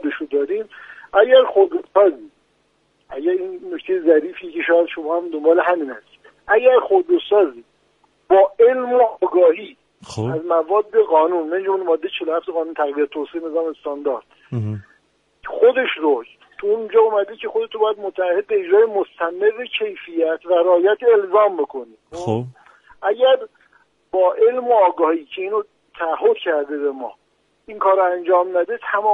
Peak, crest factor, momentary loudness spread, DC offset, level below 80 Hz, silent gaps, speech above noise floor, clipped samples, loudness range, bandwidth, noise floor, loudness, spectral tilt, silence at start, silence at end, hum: 0 dBFS; 18 dB; 13 LU; under 0.1%; -64 dBFS; none; 46 dB; under 0.1%; 4 LU; 7.4 kHz; -63 dBFS; -18 LUFS; -7 dB/octave; 0.05 s; 0 s; none